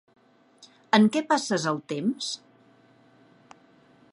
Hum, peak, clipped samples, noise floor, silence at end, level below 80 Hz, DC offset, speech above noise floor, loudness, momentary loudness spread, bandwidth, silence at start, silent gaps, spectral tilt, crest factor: none; -4 dBFS; under 0.1%; -58 dBFS; 1.75 s; -78 dBFS; under 0.1%; 34 dB; -25 LUFS; 12 LU; 11 kHz; 0.95 s; none; -4.5 dB/octave; 24 dB